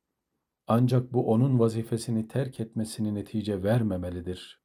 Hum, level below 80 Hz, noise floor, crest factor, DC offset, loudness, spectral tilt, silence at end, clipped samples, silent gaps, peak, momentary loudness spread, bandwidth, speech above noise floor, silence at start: none; -64 dBFS; -83 dBFS; 18 dB; under 0.1%; -28 LUFS; -7.5 dB/octave; 0.1 s; under 0.1%; none; -10 dBFS; 9 LU; 14 kHz; 56 dB; 0.7 s